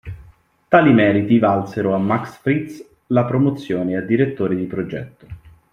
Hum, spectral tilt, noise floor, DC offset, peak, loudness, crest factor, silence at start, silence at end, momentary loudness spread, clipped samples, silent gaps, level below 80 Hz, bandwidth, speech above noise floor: none; -8.5 dB/octave; -49 dBFS; under 0.1%; -2 dBFS; -18 LUFS; 16 dB; 0.05 s; 0.25 s; 13 LU; under 0.1%; none; -50 dBFS; 10 kHz; 32 dB